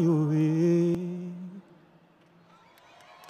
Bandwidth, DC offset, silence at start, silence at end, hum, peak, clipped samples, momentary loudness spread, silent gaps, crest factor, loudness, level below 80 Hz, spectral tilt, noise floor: 9 kHz; under 0.1%; 0 s; 0.05 s; none; -16 dBFS; under 0.1%; 20 LU; none; 14 dB; -26 LUFS; -72 dBFS; -9 dB/octave; -59 dBFS